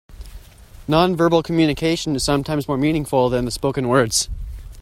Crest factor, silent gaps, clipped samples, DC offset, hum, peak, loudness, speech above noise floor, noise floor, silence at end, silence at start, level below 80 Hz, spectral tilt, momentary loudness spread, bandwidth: 18 dB; none; under 0.1%; under 0.1%; none; -2 dBFS; -19 LUFS; 24 dB; -42 dBFS; 0 s; 0.1 s; -36 dBFS; -5 dB/octave; 6 LU; 16 kHz